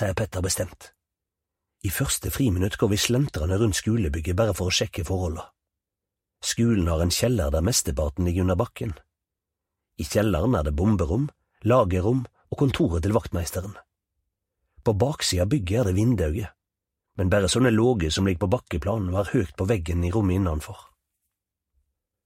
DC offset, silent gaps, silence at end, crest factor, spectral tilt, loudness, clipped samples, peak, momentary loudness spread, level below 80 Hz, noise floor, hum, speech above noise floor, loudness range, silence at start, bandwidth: under 0.1%; none; 1.45 s; 20 dB; -5.5 dB/octave; -24 LUFS; under 0.1%; -4 dBFS; 10 LU; -38 dBFS; -87 dBFS; none; 63 dB; 3 LU; 0 s; 16 kHz